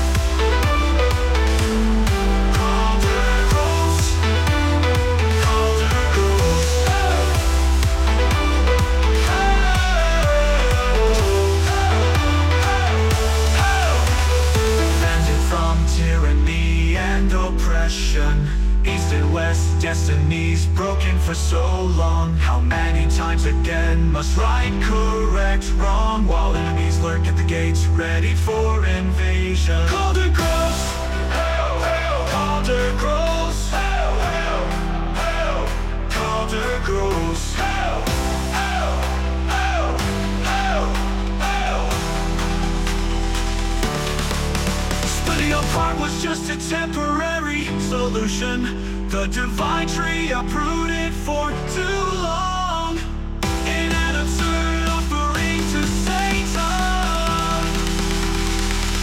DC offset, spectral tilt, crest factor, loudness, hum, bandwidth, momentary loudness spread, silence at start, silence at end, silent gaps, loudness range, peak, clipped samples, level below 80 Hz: under 0.1%; -5 dB/octave; 12 dB; -20 LUFS; none; 16 kHz; 5 LU; 0 s; 0 s; none; 5 LU; -6 dBFS; under 0.1%; -22 dBFS